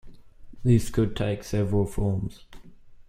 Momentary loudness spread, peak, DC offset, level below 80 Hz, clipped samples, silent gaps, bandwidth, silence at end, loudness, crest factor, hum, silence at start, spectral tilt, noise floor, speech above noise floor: 8 LU; -8 dBFS; under 0.1%; -40 dBFS; under 0.1%; none; 15 kHz; 0.05 s; -26 LUFS; 20 dB; none; 0.05 s; -7.5 dB/octave; -46 dBFS; 22 dB